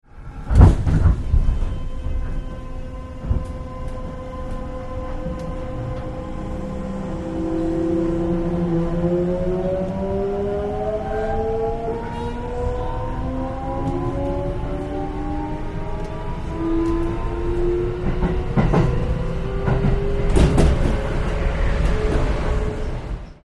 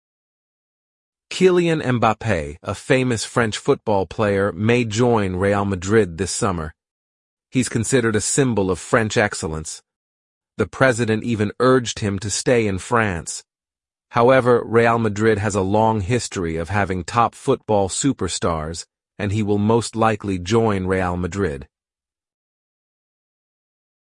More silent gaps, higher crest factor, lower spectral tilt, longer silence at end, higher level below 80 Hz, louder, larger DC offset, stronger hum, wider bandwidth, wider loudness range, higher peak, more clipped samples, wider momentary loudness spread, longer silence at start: second, none vs 6.91-7.37 s, 9.96-10.41 s; about the same, 20 dB vs 18 dB; first, -8 dB/octave vs -5 dB/octave; second, 0.1 s vs 2.4 s; first, -24 dBFS vs -48 dBFS; second, -23 LUFS vs -19 LUFS; neither; neither; about the same, 11 kHz vs 11.5 kHz; first, 9 LU vs 3 LU; about the same, 0 dBFS vs -2 dBFS; neither; first, 12 LU vs 9 LU; second, 0.15 s vs 1.3 s